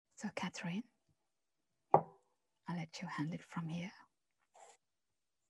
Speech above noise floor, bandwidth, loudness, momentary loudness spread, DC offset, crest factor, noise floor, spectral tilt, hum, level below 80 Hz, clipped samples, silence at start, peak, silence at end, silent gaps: over 47 dB; 11.5 kHz; -41 LUFS; 17 LU; under 0.1%; 32 dB; under -90 dBFS; -6 dB/octave; none; -86 dBFS; under 0.1%; 0.2 s; -10 dBFS; 0.8 s; none